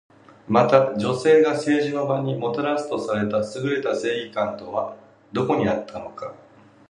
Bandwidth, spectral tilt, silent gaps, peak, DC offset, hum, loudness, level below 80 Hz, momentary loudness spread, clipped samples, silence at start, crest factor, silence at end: 10.5 kHz; -6.5 dB/octave; none; 0 dBFS; under 0.1%; none; -22 LUFS; -60 dBFS; 14 LU; under 0.1%; 0.5 s; 22 dB; 0.55 s